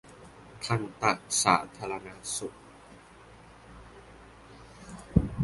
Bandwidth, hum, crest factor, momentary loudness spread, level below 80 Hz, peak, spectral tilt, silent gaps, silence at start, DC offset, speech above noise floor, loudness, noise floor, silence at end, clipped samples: 12 kHz; none; 26 dB; 27 LU; -46 dBFS; -6 dBFS; -4 dB/octave; none; 0.05 s; under 0.1%; 23 dB; -29 LUFS; -53 dBFS; 0 s; under 0.1%